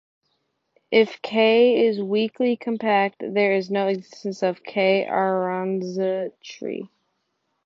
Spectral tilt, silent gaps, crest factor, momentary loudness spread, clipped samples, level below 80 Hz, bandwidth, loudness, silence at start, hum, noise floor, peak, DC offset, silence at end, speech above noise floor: -6 dB/octave; none; 18 dB; 14 LU; under 0.1%; -74 dBFS; 7.2 kHz; -22 LUFS; 0.9 s; none; -74 dBFS; -6 dBFS; under 0.1%; 0.8 s; 52 dB